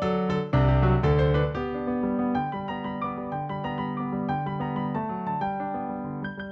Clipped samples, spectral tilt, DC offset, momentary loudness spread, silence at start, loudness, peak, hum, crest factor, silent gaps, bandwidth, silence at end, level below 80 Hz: under 0.1%; -9 dB/octave; under 0.1%; 10 LU; 0 s; -27 LUFS; -10 dBFS; none; 16 dB; none; 6.2 kHz; 0 s; -38 dBFS